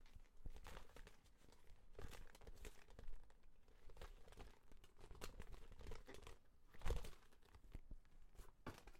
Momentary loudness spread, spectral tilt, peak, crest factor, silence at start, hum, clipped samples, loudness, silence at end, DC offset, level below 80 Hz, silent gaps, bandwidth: 13 LU; -4.5 dB/octave; -30 dBFS; 24 dB; 0 s; none; under 0.1%; -61 LUFS; 0 s; under 0.1%; -58 dBFS; none; 16 kHz